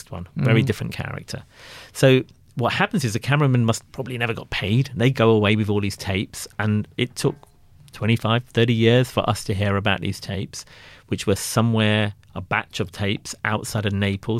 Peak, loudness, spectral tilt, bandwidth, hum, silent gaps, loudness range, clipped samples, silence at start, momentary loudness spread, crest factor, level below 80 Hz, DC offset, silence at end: -4 dBFS; -22 LUFS; -5.5 dB/octave; 15 kHz; none; none; 3 LU; under 0.1%; 0.1 s; 14 LU; 18 dB; -50 dBFS; under 0.1%; 0 s